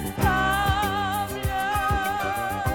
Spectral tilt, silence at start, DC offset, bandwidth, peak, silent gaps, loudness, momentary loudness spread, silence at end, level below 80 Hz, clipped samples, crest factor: -4.5 dB/octave; 0 s; under 0.1%; 19.5 kHz; -8 dBFS; none; -24 LUFS; 5 LU; 0 s; -36 dBFS; under 0.1%; 16 dB